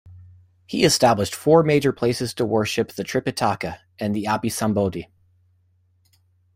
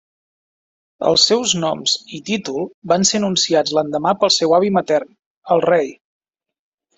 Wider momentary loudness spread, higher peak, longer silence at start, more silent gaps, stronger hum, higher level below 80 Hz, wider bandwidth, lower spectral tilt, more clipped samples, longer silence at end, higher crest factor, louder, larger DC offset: first, 12 LU vs 9 LU; about the same, -2 dBFS vs -2 dBFS; second, 0.05 s vs 1 s; second, none vs 2.74-2.82 s, 5.26-5.42 s; neither; first, -54 dBFS vs -60 dBFS; first, 16 kHz vs 8.4 kHz; first, -5 dB/octave vs -3 dB/octave; neither; first, 1.5 s vs 1.05 s; about the same, 20 dB vs 18 dB; second, -21 LUFS vs -17 LUFS; neither